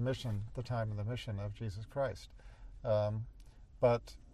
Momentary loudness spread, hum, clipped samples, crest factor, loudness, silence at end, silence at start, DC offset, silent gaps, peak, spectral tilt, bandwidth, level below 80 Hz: 18 LU; none; under 0.1%; 20 dB; -37 LUFS; 0 s; 0 s; under 0.1%; none; -16 dBFS; -7 dB/octave; 12 kHz; -54 dBFS